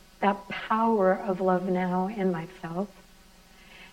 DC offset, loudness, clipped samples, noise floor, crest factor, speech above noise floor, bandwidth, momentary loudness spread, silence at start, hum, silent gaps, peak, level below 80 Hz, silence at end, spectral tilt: under 0.1%; -27 LUFS; under 0.1%; -54 dBFS; 18 dB; 28 dB; 14 kHz; 11 LU; 0.2 s; none; none; -10 dBFS; -58 dBFS; 0.05 s; -7.5 dB/octave